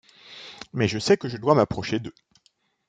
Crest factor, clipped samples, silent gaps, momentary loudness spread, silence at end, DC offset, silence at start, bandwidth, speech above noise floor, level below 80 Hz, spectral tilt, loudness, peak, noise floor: 22 dB; under 0.1%; none; 20 LU; 0.8 s; under 0.1%; 0.3 s; 9.2 kHz; 44 dB; -56 dBFS; -5.5 dB/octave; -24 LUFS; -4 dBFS; -67 dBFS